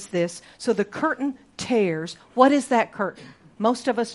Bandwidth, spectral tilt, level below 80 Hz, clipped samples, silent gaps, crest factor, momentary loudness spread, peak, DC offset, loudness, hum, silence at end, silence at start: 11.5 kHz; -5 dB/octave; -66 dBFS; under 0.1%; none; 22 dB; 12 LU; -2 dBFS; under 0.1%; -23 LUFS; none; 0 s; 0 s